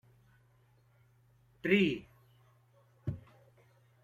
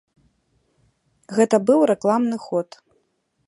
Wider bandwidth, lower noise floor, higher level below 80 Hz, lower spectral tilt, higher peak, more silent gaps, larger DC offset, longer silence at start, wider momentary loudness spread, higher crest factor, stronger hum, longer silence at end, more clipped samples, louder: first, 13.5 kHz vs 11.5 kHz; about the same, -67 dBFS vs -69 dBFS; about the same, -66 dBFS vs -70 dBFS; about the same, -7 dB/octave vs -6 dB/octave; second, -14 dBFS vs -4 dBFS; neither; neither; first, 1.65 s vs 1.3 s; first, 16 LU vs 10 LU; first, 24 dB vs 18 dB; neither; about the same, 0.85 s vs 0.85 s; neither; second, -33 LUFS vs -20 LUFS